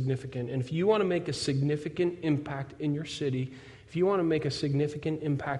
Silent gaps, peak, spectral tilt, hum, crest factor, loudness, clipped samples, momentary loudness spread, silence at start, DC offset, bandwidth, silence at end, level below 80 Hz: none; -14 dBFS; -6.5 dB/octave; none; 16 dB; -30 LUFS; under 0.1%; 8 LU; 0 s; under 0.1%; 11.5 kHz; 0 s; -62 dBFS